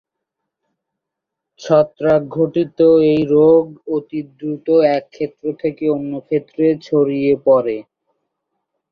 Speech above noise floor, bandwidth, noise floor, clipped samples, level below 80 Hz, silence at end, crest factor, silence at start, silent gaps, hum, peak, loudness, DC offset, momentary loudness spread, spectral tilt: 66 dB; 6.8 kHz; -81 dBFS; under 0.1%; -58 dBFS; 1.1 s; 14 dB; 1.6 s; none; none; -2 dBFS; -16 LUFS; under 0.1%; 13 LU; -8.5 dB/octave